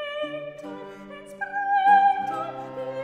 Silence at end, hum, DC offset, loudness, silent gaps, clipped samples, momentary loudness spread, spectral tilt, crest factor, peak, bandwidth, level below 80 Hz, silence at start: 0 s; none; under 0.1%; -23 LUFS; none; under 0.1%; 22 LU; -4.5 dB/octave; 18 dB; -8 dBFS; 10 kHz; -68 dBFS; 0 s